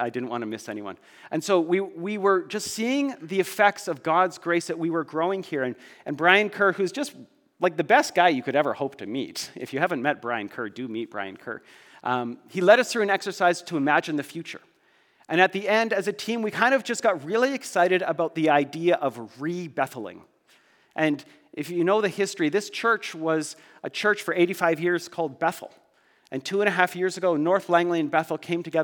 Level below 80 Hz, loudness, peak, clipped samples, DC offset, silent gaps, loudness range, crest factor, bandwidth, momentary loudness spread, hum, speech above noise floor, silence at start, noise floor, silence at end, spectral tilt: -82 dBFS; -24 LUFS; -2 dBFS; under 0.1%; under 0.1%; none; 4 LU; 24 dB; 19.5 kHz; 13 LU; none; 38 dB; 0 s; -63 dBFS; 0 s; -4.5 dB/octave